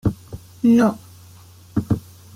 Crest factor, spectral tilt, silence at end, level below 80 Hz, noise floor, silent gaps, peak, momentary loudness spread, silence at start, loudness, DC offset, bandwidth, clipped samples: 16 dB; -8 dB/octave; 0.35 s; -44 dBFS; -45 dBFS; none; -6 dBFS; 22 LU; 0.05 s; -20 LUFS; under 0.1%; 15.5 kHz; under 0.1%